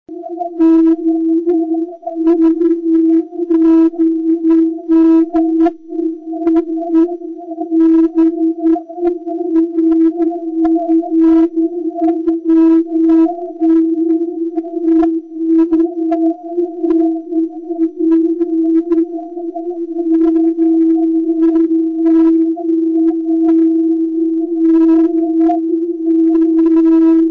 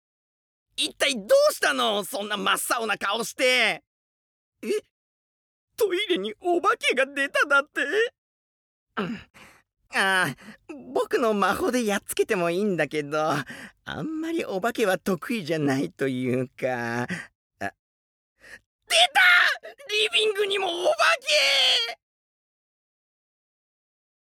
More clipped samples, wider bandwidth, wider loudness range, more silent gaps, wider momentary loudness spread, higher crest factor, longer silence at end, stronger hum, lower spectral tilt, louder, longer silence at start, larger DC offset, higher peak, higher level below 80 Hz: neither; second, 2.9 kHz vs 18.5 kHz; second, 3 LU vs 7 LU; second, none vs 3.87-4.52 s, 4.91-5.68 s, 8.18-8.86 s, 17.35-17.50 s, 17.79-18.36 s, 18.66-18.79 s; second, 9 LU vs 15 LU; second, 8 dB vs 20 dB; second, 0 s vs 2.45 s; neither; first, -8.5 dB/octave vs -3 dB/octave; first, -13 LUFS vs -23 LUFS; second, 0.1 s vs 0.8 s; neither; about the same, -4 dBFS vs -6 dBFS; first, -52 dBFS vs -66 dBFS